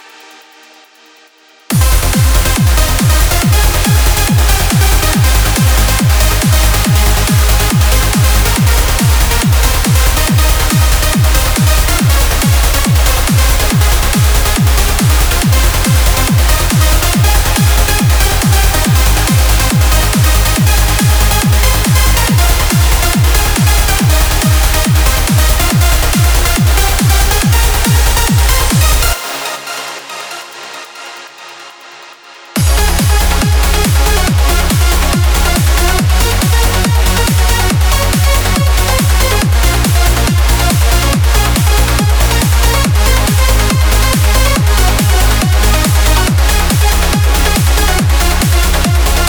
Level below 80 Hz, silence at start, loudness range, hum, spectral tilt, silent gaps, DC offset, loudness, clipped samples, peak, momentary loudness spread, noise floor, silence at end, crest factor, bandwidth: -12 dBFS; 1.7 s; 2 LU; none; -4 dB/octave; none; under 0.1%; -10 LUFS; under 0.1%; 0 dBFS; 1 LU; -44 dBFS; 0 s; 10 dB; over 20 kHz